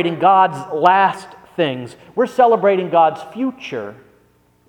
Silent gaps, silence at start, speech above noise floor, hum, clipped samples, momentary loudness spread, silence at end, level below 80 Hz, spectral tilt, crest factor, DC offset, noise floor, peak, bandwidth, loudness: none; 0 s; 40 dB; 60 Hz at -50 dBFS; under 0.1%; 16 LU; 0.75 s; -64 dBFS; -6 dB/octave; 16 dB; under 0.1%; -56 dBFS; 0 dBFS; 11.5 kHz; -16 LUFS